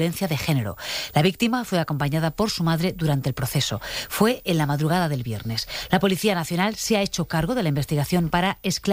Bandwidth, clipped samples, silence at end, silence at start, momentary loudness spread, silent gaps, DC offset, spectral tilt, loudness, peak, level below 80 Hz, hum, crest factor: 15.5 kHz; under 0.1%; 0 s; 0 s; 5 LU; none; under 0.1%; -5 dB/octave; -23 LUFS; -6 dBFS; -46 dBFS; none; 18 dB